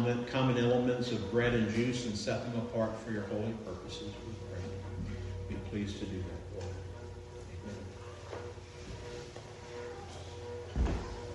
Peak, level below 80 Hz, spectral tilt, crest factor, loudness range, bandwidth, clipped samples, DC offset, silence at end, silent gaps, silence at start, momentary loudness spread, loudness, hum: -18 dBFS; -48 dBFS; -6 dB/octave; 18 dB; 13 LU; 11.5 kHz; under 0.1%; under 0.1%; 0 s; none; 0 s; 16 LU; -37 LUFS; none